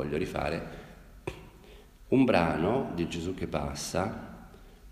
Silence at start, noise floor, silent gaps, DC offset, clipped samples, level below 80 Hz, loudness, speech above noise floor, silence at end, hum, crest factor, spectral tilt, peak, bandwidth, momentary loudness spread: 0 s; -52 dBFS; none; under 0.1%; under 0.1%; -48 dBFS; -30 LUFS; 23 dB; 0 s; none; 22 dB; -6 dB/octave; -10 dBFS; 15 kHz; 22 LU